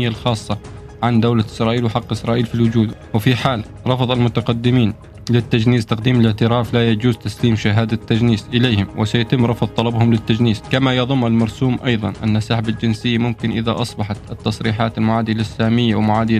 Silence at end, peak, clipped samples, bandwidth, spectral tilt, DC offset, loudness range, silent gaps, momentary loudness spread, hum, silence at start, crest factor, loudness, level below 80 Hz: 0 s; 0 dBFS; under 0.1%; 13 kHz; -7 dB/octave; under 0.1%; 3 LU; none; 5 LU; none; 0 s; 16 dB; -17 LUFS; -42 dBFS